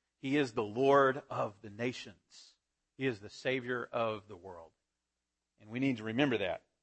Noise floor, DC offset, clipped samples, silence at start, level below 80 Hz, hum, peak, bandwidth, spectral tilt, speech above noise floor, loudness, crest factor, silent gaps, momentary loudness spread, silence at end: -88 dBFS; under 0.1%; under 0.1%; 0.25 s; -74 dBFS; none; -14 dBFS; 8.6 kHz; -6 dB/octave; 54 dB; -34 LUFS; 22 dB; none; 19 LU; 0.25 s